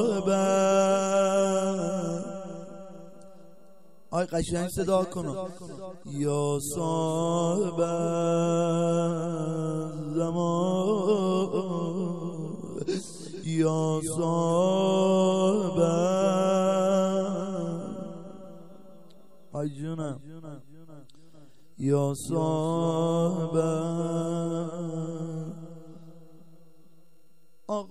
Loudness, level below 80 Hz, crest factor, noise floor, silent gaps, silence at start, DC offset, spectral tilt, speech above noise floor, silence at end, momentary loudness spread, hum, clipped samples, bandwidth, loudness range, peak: -27 LUFS; -58 dBFS; 16 dB; -67 dBFS; none; 0 s; 0.4%; -6.5 dB/octave; 41 dB; 0.05 s; 16 LU; none; under 0.1%; 14 kHz; 11 LU; -10 dBFS